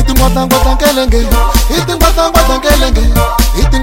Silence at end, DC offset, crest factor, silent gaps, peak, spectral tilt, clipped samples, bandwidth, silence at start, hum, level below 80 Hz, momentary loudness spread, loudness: 0 s; under 0.1%; 8 dB; none; 0 dBFS; -4.5 dB/octave; 0.5%; 17 kHz; 0 s; none; -10 dBFS; 2 LU; -10 LUFS